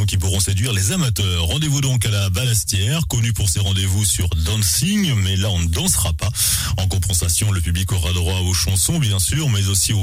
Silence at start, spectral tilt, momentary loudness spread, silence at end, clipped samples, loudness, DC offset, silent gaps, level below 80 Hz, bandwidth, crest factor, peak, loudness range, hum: 0 s; -3.5 dB/octave; 3 LU; 0 s; under 0.1%; -18 LUFS; under 0.1%; none; -30 dBFS; 16.5 kHz; 12 dB; -6 dBFS; 1 LU; none